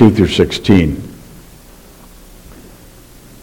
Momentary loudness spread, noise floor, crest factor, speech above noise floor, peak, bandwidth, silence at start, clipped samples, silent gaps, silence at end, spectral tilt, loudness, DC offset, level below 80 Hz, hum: 22 LU; -39 dBFS; 16 dB; 29 dB; 0 dBFS; 17.5 kHz; 0 s; 0.4%; none; 2.25 s; -6.5 dB/octave; -13 LUFS; under 0.1%; -34 dBFS; none